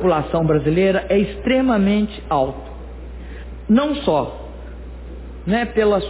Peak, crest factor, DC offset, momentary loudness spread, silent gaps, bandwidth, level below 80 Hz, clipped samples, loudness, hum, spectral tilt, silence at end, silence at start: -6 dBFS; 14 dB; under 0.1%; 19 LU; none; 4 kHz; -34 dBFS; under 0.1%; -18 LUFS; none; -11 dB/octave; 0 s; 0 s